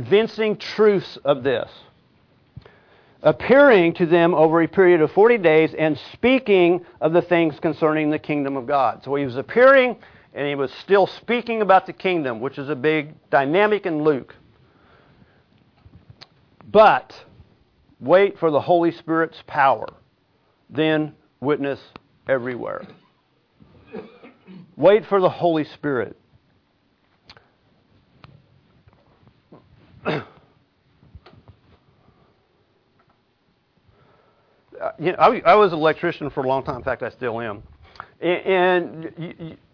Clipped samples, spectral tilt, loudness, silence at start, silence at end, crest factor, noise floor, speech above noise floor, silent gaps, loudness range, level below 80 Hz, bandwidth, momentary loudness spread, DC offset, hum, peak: under 0.1%; -8 dB/octave; -19 LUFS; 0 s; 0.2 s; 18 dB; -65 dBFS; 46 dB; none; 18 LU; -58 dBFS; 5.4 kHz; 16 LU; under 0.1%; none; -4 dBFS